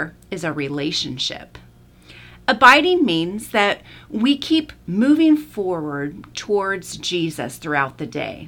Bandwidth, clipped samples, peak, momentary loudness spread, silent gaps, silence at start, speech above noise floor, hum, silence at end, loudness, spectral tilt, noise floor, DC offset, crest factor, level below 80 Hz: 17.5 kHz; under 0.1%; 0 dBFS; 15 LU; none; 0 s; 27 dB; none; 0 s; -19 LUFS; -4.5 dB/octave; -47 dBFS; under 0.1%; 20 dB; -52 dBFS